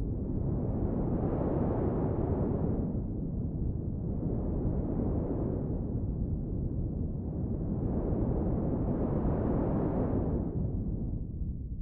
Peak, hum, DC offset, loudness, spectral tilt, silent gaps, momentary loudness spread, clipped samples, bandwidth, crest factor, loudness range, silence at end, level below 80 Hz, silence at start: -18 dBFS; none; under 0.1%; -33 LUFS; -13 dB/octave; none; 5 LU; under 0.1%; 2.9 kHz; 14 dB; 2 LU; 0 s; -38 dBFS; 0 s